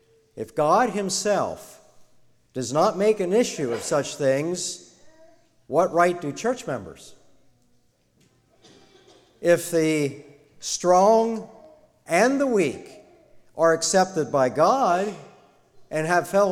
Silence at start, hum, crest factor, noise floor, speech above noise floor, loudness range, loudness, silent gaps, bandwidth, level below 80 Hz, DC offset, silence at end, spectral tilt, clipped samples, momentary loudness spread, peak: 0.35 s; none; 18 dB; -63 dBFS; 41 dB; 5 LU; -22 LUFS; none; 16.5 kHz; -64 dBFS; under 0.1%; 0 s; -4 dB/octave; under 0.1%; 14 LU; -6 dBFS